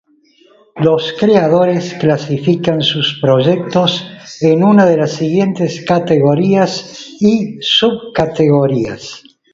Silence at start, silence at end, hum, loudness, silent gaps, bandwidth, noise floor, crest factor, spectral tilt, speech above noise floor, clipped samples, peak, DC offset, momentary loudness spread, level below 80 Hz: 0.75 s; 0.35 s; none; -13 LUFS; none; 7.6 kHz; -50 dBFS; 12 dB; -6 dB/octave; 37 dB; under 0.1%; 0 dBFS; under 0.1%; 8 LU; -50 dBFS